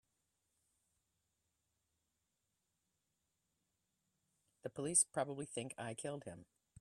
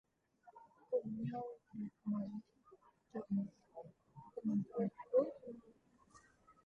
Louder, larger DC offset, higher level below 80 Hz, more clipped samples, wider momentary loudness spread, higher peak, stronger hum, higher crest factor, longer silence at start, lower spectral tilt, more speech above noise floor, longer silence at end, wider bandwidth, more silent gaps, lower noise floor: first, -39 LUFS vs -42 LUFS; neither; about the same, -84 dBFS vs -80 dBFS; neither; second, 19 LU vs 22 LU; first, -18 dBFS vs -22 dBFS; neither; first, 28 dB vs 22 dB; first, 4.65 s vs 0.45 s; second, -3 dB/octave vs -10 dB/octave; first, 46 dB vs 28 dB; first, 0.35 s vs 0.15 s; first, 13 kHz vs 6.8 kHz; neither; first, -87 dBFS vs -69 dBFS